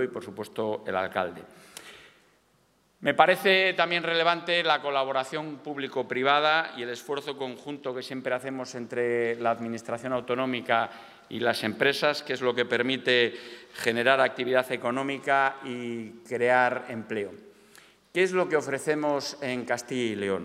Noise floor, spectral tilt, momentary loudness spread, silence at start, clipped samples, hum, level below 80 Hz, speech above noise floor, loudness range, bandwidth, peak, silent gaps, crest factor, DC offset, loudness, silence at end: -66 dBFS; -4 dB/octave; 13 LU; 0 s; under 0.1%; none; -76 dBFS; 39 dB; 5 LU; 16 kHz; -4 dBFS; none; 24 dB; under 0.1%; -27 LUFS; 0 s